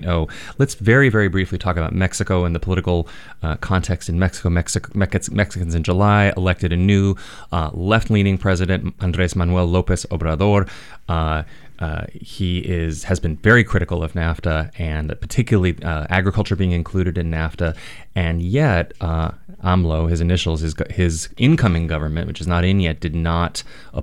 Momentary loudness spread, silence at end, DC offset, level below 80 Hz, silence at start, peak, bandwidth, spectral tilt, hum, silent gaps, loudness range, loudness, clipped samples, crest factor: 10 LU; 0 s; 1%; -30 dBFS; 0 s; -2 dBFS; 12 kHz; -6 dB/octave; none; none; 3 LU; -19 LUFS; under 0.1%; 18 dB